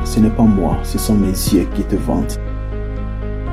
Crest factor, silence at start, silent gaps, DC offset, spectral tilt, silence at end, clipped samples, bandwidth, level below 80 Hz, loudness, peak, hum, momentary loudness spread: 14 dB; 0 s; none; under 0.1%; -6.5 dB/octave; 0 s; under 0.1%; 16 kHz; -22 dBFS; -17 LUFS; -2 dBFS; none; 12 LU